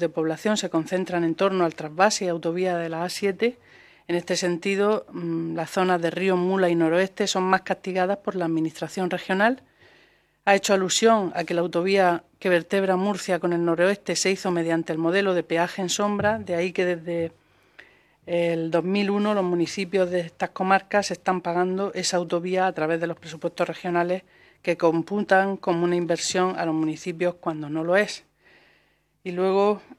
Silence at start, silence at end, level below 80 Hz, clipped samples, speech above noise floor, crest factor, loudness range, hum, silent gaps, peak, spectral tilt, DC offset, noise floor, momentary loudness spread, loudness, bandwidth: 0 s; 0.05 s; -70 dBFS; under 0.1%; 41 dB; 20 dB; 4 LU; none; none; -4 dBFS; -4.5 dB/octave; under 0.1%; -65 dBFS; 7 LU; -24 LUFS; 14 kHz